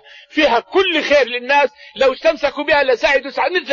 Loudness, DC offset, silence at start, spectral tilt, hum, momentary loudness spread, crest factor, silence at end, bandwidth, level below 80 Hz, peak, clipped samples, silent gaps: -15 LUFS; under 0.1%; 0.35 s; -2.5 dB/octave; none; 5 LU; 12 dB; 0 s; 7.4 kHz; -48 dBFS; -4 dBFS; under 0.1%; none